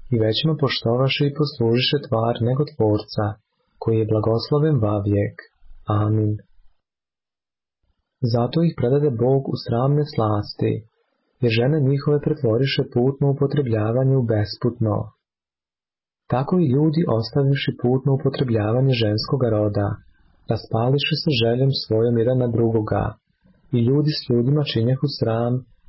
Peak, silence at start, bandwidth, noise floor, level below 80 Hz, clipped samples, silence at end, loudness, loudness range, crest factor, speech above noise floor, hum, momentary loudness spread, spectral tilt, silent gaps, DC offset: -8 dBFS; 0.05 s; 5.8 kHz; under -90 dBFS; -48 dBFS; under 0.1%; 0.25 s; -21 LUFS; 3 LU; 12 dB; over 70 dB; none; 6 LU; -11 dB/octave; none; under 0.1%